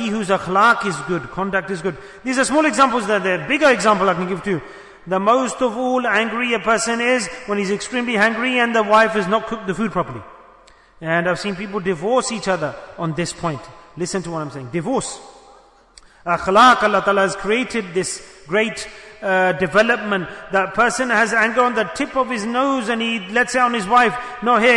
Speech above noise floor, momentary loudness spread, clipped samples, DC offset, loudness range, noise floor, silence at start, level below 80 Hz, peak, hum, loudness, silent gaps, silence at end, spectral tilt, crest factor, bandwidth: 30 dB; 12 LU; under 0.1%; under 0.1%; 6 LU; -49 dBFS; 0 s; -52 dBFS; -2 dBFS; none; -18 LUFS; none; 0 s; -4 dB/octave; 16 dB; 11 kHz